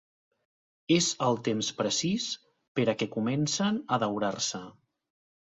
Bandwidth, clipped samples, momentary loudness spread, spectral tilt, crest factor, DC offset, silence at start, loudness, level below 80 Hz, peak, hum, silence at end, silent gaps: 8.4 kHz; under 0.1%; 9 LU; -4 dB/octave; 20 dB; under 0.1%; 0.9 s; -29 LUFS; -68 dBFS; -12 dBFS; none; 0.9 s; 2.68-2.75 s